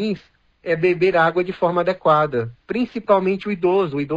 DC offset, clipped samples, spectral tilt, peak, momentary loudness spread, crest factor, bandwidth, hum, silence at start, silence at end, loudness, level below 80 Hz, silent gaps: under 0.1%; under 0.1%; -8 dB/octave; -4 dBFS; 9 LU; 16 dB; 7.4 kHz; none; 0 s; 0 s; -19 LUFS; -54 dBFS; none